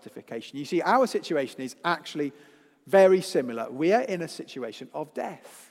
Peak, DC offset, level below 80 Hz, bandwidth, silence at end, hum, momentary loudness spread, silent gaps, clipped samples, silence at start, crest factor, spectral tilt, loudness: -8 dBFS; under 0.1%; -84 dBFS; 15.5 kHz; 0.1 s; none; 17 LU; none; under 0.1%; 0.05 s; 20 dB; -5 dB/octave; -26 LUFS